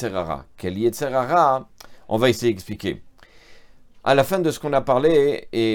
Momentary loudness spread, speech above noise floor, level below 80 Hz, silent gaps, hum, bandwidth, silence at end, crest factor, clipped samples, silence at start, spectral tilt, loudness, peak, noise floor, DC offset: 12 LU; 26 dB; -50 dBFS; none; none; 19.5 kHz; 0 s; 18 dB; under 0.1%; 0 s; -5.5 dB/octave; -21 LUFS; -2 dBFS; -46 dBFS; under 0.1%